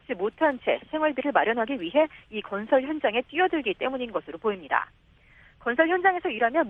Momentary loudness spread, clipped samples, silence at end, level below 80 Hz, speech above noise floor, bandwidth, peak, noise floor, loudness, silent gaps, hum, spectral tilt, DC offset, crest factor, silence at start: 9 LU; under 0.1%; 0 s; -62 dBFS; 30 dB; 4 kHz; -6 dBFS; -56 dBFS; -26 LUFS; none; none; -7 dB/octave; under 0.1%; 20 dB; 0.1 s